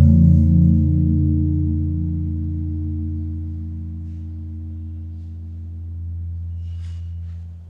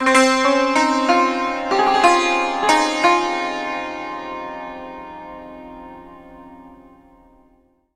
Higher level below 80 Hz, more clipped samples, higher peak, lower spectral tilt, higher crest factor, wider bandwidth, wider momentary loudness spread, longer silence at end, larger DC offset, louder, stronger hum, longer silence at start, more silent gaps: first, -28 dBFS vs -52 dBFS; neither; about the same, -2 dBFS vs 0 dBFS; first, -12.5 dB/octave vs -2 dB/octave; about the same, 18 dB vs 20 dB; second, 0.9 kHz vs 15 kHz; second, 18 LU vs 22 LU; second, 0 s vs 1.2 s; neither; second, -20 LUFS vs -17 LUFS; neither; about the same, 0 s vs 0 s; neither